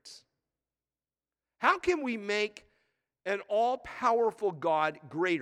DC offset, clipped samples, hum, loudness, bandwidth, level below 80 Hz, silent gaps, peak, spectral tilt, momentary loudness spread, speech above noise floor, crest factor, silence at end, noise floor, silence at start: under 0.1%; under 0.1%; none; -30 LUFS; 12 kHz; -68 dBFS; none; -10 dBFS; -4.5 dB/octave; 8 LU; over 60 dB; 22 dB; 0 s; under -90 dBFS; 0.05 s